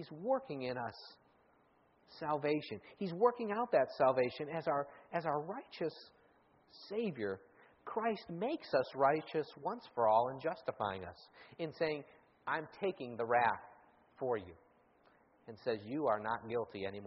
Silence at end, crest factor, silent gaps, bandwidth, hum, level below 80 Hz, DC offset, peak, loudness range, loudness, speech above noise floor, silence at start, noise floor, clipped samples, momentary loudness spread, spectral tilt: 0 s; 20 dB; none; 5.8 kHz; none; -78 dBFS; under 0.1%; -18 dBFS; 6 LU; -37 LUFS; 34 dB; 0 s; -71 dBFS; under 0.1%; 14 LU; -4 dB/octave